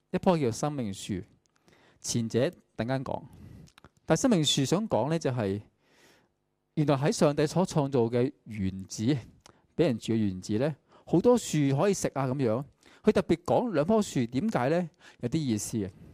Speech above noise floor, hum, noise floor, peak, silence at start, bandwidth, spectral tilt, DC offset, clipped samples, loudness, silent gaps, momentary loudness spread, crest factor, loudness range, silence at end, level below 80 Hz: 49 dB; none; -77 dBFS; -10 dBFS; 0.15 s; 15.5 kHz; -5.5 dB/octave; under 0.1%; under 0.1%; -28 LUFS; none; 11 LU; 18 dB; 4 LU; 0.1 s; -60 dBFS